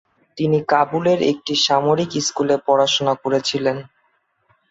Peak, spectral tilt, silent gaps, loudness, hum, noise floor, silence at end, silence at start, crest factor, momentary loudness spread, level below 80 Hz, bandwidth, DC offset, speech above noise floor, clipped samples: -4 dBFS; -4 dB/octave; none; -18 LUFS; none; -65 dBFS; 0.85 s; 0.35 s; 16 dB; 6 LU; -62 dBFS; 8 kHz; under 0.1%; 47 dB; under 0.1%